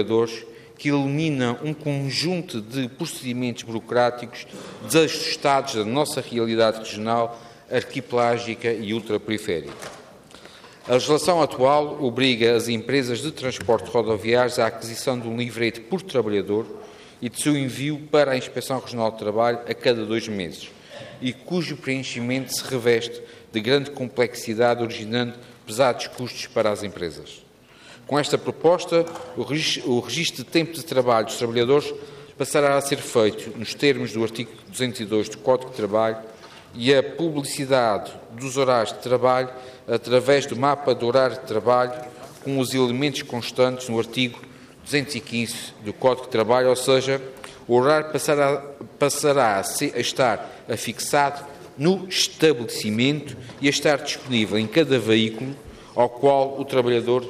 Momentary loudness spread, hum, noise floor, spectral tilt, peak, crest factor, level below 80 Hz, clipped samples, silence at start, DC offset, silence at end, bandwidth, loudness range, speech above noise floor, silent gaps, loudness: 13 LU; none; -49 dBFS; -4.5 dB/octave; -6 dBFS; 18 dB; -64 dBFS; under 0.1%; 0 s; under 0.1%; 0 s; 15.5 kHz; 4 LU; 26 dB; none; -23 LUFS